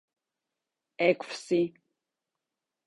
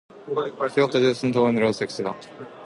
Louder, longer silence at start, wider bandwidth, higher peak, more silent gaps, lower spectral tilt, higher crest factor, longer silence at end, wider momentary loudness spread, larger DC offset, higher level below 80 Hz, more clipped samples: second, -29 LUFS vs -23 LUFS; first, 1 s vs 0.15 s; about the same, 11.5 kHz vs 11.5 kHz; second, -10 dBFS vs -6 dBFS; neither; about the same, -5.5 dB/octave vs -6 dB/octave; first, 22 dB vs 16 dB; first, 1.2 s vs 0 s; second, 6 LU vs 11 LU; neither; second, -78 dBFS vs -64 dBFS; neither